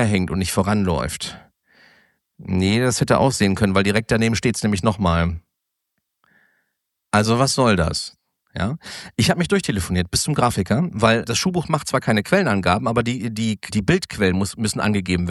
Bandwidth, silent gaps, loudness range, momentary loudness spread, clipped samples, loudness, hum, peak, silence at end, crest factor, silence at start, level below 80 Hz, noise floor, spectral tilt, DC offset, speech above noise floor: 12.5 kHz; none; 3 LU; 9 LU; under 0.1%; -20 LUFS; none; -2 dBFS; 0 s; 18 dB; 0 s; -40 dBFS; -79 dBFS; -5 dB/octave; under 0.1%; 59 dB